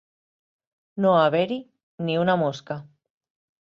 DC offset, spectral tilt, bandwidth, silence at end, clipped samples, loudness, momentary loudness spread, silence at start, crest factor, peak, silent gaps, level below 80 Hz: under 0.1%; -7 dB/octave; 7.4 kHz; 0.8 s; under 0.1%; -23 LUFS; 16 LU; 0.95 s; 18 dB; -8 dBFS; 1.83-1.98 s; -70 dBFS